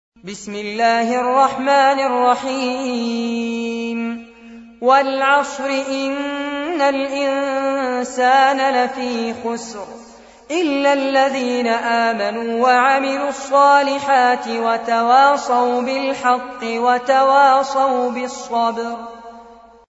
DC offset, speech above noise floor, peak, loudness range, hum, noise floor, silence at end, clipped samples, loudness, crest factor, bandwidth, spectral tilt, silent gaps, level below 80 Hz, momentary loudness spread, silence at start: under 0.1%; 26 dB; -2 dBFS; 4 LU; none; -43 dBFS; 0.35 s; under 0.1%; -17 LUFS; 16 dB; 8 kHz; -3 dB/octave; none; -60 dBFS; 12 LU; 0.25 s